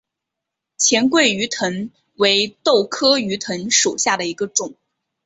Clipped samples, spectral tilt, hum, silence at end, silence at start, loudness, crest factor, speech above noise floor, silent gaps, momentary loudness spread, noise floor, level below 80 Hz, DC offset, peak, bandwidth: under 0.1%; -2 dB/octave; none; 0.55 s; 0.8 s; -17 LUFS; 18 dB; 64 dB; none; 9 LU; -82 dBFS; -64 dBFS; under 0.1%; -2 dBFS; 8.2 kHz